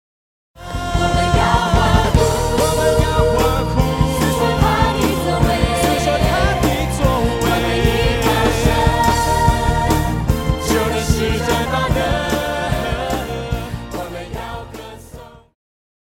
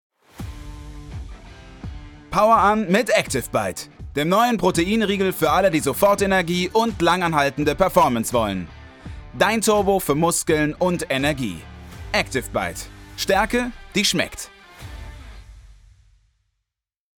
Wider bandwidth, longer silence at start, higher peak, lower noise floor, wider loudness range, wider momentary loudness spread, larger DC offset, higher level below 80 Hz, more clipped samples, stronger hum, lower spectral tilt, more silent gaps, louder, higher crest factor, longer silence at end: second, 17 kHz vs 19 kHz; first, 0.55 s vs 0.4 s; about the same, 0 dBFS vs -2 dBFS; second, -38 dBFS vs -84 dBFS; about the same, 6 LU vs 5 LU; second, 12 LU vs 21 LU; neither; first, -24 dBFS vs -42 dBFS; neither; neither; about the same, -5 dB/octave vs -4 dB/octave; neither; first, -17 LUFS vs -20 LUFS; about the same, 16 dB vs 20 dB; second, 0.75 s vs 1.55 s